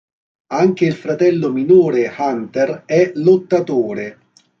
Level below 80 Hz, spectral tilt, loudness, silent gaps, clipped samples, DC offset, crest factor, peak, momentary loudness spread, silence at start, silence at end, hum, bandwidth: -62 dBFS; -7.5 dB/octave; -16 LUFS; none; under 0.1%; under 0.1%; 14 dB; -2 dBFS; 9 LU; 0.5 s; 0.5 s; none; 6.8 kHz